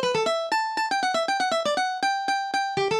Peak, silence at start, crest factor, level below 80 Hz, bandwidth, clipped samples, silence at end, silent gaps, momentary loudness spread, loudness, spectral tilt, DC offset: -12 dBFS; 0 s; 12 dB; -68 dBFS; 13.5 kHz; under 0.1%; 0 s; none; 2 LU; -25 LUFS; -2.5 dB/octave; under 0.1%